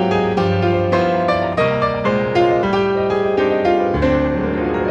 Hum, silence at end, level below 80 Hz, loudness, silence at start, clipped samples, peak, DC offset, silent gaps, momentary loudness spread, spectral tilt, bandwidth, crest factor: none; 0 s; -36 dBFS; -17 LUFS; 0 s; under 0.1%; -4 dBFS; under 0.1%; none; 2 LU; -7.5 dB/octave; 8.6 kHz; 12 dB